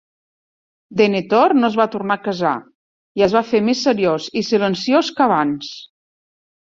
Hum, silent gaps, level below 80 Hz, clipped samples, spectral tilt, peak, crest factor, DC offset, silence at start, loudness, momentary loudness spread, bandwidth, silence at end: none; 2.75-3.15 s; -60 dBFS; under 0.1%; -5.5 dB/octave; -2 dBFS; 16 dB; under 0.1%; 0.9 s; -17 LUFS; 11 LU; 7.6 kHz; 0.85 s